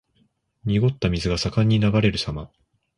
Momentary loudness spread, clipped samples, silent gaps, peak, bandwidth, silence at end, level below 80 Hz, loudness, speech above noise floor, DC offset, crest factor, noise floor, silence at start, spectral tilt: 11 LU; under 0.1%; none; -6 dBFS; 11 kHz; 0.5 s; -40 dBFS; -22 LUFS; 45 dB; under 0.1%; 16 dB; -66 dBFS; 0.65 s; -6.5 dB/octave